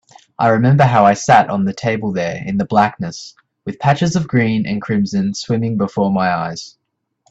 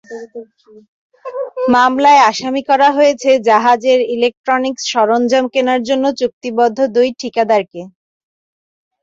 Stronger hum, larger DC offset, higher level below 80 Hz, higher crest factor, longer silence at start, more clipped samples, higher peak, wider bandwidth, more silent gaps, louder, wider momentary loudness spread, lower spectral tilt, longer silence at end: neither; neither; first, -52 dBFS vs -60 dBFS; about the same, 16 dB vs 14 dB; first, 0.4 s vs 0.1 s; neither; about the same, 0 dBFS vs 0 dBFS; about the same, 8 kHz vs 7.8 kHz; second, none vs 0.88-1.10 s, 4.37-4.44 s, 6.33-6.41 s; second, -16 LUFS vs -13 LUFS; about the same, 15 LU vs 17 LU; first, -6.5 dB/octave vs -3.5 dB/octave; second, 0.6 s vs 1.15 s